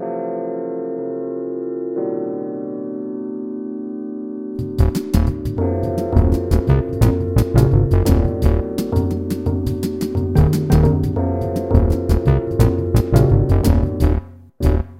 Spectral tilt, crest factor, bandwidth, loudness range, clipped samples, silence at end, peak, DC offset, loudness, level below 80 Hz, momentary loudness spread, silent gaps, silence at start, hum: -8.5 dB/octave; 16 dB; 16.5 kHz; 8 LU; under 0.1%; 0 s; 0 dBFS; under 0.1%; -19 LUFS; -22 dBFS; 12 LU; none; 0 s; none